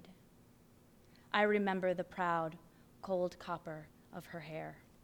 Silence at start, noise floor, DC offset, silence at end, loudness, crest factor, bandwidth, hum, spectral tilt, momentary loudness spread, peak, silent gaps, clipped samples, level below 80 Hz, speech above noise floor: 0 s; -64 dBFS; under 0.1%; 0.25 s; -37 LUFS; 22 dB; over 20 kHz; none; -6.5 dB/octave; 19 LU; -16 dBFS; none; under 0.1%; -72 dBFS; 27 dB